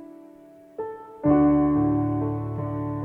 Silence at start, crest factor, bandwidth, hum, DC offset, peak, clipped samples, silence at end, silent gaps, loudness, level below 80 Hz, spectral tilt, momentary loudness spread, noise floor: 0 s; 16 dB; 2.8 kHz; none; under 0.1%; -8 dBFS; under 0.1%; 0 s; none; -23 LUFS; -46 dBFS; -12 dB/octave; 17 LU; -49 dBFS